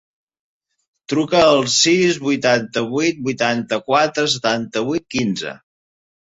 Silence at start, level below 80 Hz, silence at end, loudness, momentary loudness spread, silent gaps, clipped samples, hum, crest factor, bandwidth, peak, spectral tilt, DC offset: 1.1 s; -56 dBFS; 0.65 s; -17 LUFS; 8 LU; none; under 0.1%; none; 18 dB; 8.4 kHz; -2 dBFS; -3.5 dB/octave; under 0.1%